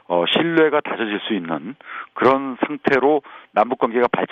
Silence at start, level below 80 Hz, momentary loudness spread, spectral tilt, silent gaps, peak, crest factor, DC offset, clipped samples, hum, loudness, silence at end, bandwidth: 0.1 s; -62 dBFS; 11 LU; -7 dB/octave; none; -2 dBFS; 16 dB; under 0.1%; under 0.1%; none; -19 LUFS; 0.05 s; 7 kHz